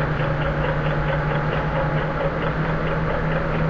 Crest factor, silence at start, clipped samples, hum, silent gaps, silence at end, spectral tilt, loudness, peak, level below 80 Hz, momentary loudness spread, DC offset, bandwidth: 12 dB; 0 s; under 0.1%; none; none; 0 s; -8.5 dB/octave; -23 LUFS; -8 dBFS; -30 dBFS; 1 LU; 0.4%; 6.4 kHz